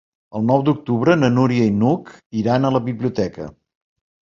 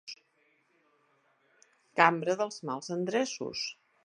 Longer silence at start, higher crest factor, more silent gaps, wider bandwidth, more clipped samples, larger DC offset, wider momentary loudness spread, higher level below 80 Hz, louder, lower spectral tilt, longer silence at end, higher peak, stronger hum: first, 0.35 s vs 0.05 s; second, 16 dB vs 28 dB; first, 2.26-2.30 s vs none; second, 7.4 kHz vs 11.5 kHz; neither; neither; about the same, 12 LU vs 13 LU; first, -52 dBFS vs -80 dBFS; first, -18 LUFS vs -30 LUFS; first, -8 dB/octave vs -4 dB/octave; first, 0.7 s vs 0.3 s; first, -2 dBFS vs -6 dBFS; neither